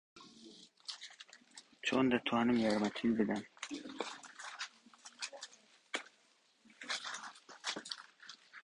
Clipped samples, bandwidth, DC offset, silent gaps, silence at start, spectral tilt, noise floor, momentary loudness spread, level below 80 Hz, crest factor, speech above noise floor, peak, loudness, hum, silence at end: under 0.1%; 11 kHz; under 0.1%; none; 0.15 s; -4 dB/octave; -72 dBFS; 24 LU; -74 dBFS; 22 dB; 37 dB; -18 dBFS; -38 LUFS; none; 0.05 s